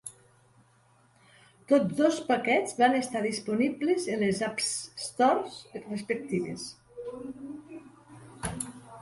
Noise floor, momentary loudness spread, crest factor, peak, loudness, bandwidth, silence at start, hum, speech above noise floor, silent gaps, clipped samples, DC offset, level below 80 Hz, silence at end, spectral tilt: -63 dBFS; 18 LU; 20 dB; -10 dBFS; -28 LUFS; 12 kHz; 0.05 s; none; 35 dB; none; under 0.1%; under 0.1%; -62 dBFS; 0 s; -4 dB/octave